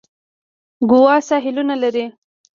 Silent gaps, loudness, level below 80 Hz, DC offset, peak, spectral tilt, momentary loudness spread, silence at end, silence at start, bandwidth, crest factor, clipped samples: none; -16 LUFS; -62 dBFS; under 0.1%; -2 dBFS; -5 dB/octave; 12 LU; 0.45 s; 0.8 s; 7.4 kHz; 16 dB; under 0.1%